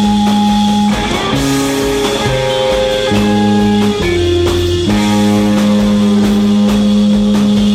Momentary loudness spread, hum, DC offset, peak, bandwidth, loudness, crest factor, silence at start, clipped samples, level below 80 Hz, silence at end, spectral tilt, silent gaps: 3 LU; none; under 0.1%; -2 dBFS; 15 kHz; -11 LUFS; 10 dB; 0 s; under 0.1%; -28 dBFS; 0 s; -5.5 dB/octave; none